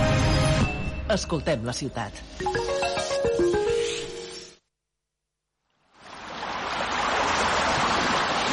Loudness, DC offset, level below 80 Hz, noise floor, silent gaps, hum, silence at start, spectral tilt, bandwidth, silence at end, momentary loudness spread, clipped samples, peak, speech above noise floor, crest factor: -25 LUFS; under 0.1%; -40 dBFS; -83 dBFS; none; none; 0 s; -4.5 dB/octave; 11.5 kHz; 0 s; 13 LU; under 0.1%; -12 dBFS; 57 dB; 14 dB